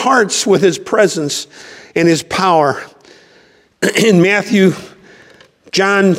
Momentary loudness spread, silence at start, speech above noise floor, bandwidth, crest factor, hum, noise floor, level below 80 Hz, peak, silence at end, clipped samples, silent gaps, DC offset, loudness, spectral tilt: 11 LU; 0 s; 36 dB; 16 kHz; 14 dB; none; -49 dBFS; -58 dBFS; 0 dBFS; 0 s; under 0.1%; none; under 0.1%; -13 LUFS; -4.5 dB/octave